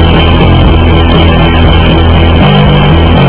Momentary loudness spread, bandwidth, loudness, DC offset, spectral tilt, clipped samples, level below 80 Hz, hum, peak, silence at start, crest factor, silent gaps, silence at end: 1 LU; 4 kHz; -5 LUFS; 5%; -11 dB/octave; 10%; -8 dBFS; none; 0 dBFS; 0 s; 4 dB; none; 0 s